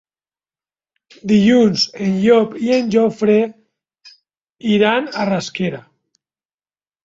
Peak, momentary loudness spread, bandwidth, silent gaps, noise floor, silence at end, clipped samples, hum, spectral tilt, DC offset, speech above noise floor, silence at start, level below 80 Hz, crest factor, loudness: -2 dBFS; 11 LU; 7.8 kHz; none; under -90 dBFS; 1.25 s; under 0.1%; none; -5.5 dB/octave; under 0.1%; over 75 dB; 1.25 s; -58 dBFS; 16 dB; -16 LUFS